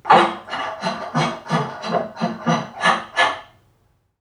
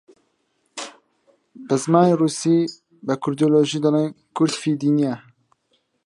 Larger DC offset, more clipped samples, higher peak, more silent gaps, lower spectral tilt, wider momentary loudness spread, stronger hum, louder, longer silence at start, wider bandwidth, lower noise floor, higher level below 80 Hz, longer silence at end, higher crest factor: neither; neither; about the same, 0 dBFS vs -2 dBFS; neither; second, -4.5 dB/octave vs -6 dB/octave; second, 9 LU vs 18 LU; neither; about the same, -21 LUFS vs -20 LUFS; second, 0.05 s vs 0.75 s; about the same, 11 kHz vs 11.5 kHz; second, -62 dBFS vs -69 dBFS; first, -62 dBFS vs -72 dBFS; second, 0.75 s vs 0.9 s; about the same, 20 dB vs 20 dB